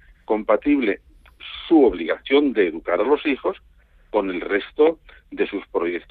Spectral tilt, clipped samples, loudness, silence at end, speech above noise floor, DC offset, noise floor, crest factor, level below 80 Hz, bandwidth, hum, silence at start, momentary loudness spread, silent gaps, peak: -8 dB/octave; under 0.1%; -21 LUFS; 0.1 s; 20 dB; under 0.1%; -40 dBFS; 16 dB; -50 dBFS; 4.6 kHz; none; 0.3 s; 16 LU; none; -4 dBFS